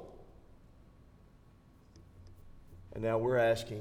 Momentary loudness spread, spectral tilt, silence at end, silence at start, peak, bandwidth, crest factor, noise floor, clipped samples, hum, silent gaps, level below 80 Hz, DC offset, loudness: 21 LU; -6 dB/octave; 0 s; 0 s; -18 dBFS; 15.5 kHz; 20 dB; -61 dBFS; under 0.1%; none; none; -58 dBFS; under 0.1%; -32 LUFS